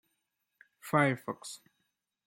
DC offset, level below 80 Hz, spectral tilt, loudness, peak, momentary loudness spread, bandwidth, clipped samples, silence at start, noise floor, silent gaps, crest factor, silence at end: under 0.1%; -78 dBFS; -5.5 dB/octave; -31 LUFS; -12 dBFS; 21 LU; 16.5 kHz; under 0.1%; 0.85 s; -82 dBFS; none; 24 dB; 0.7 s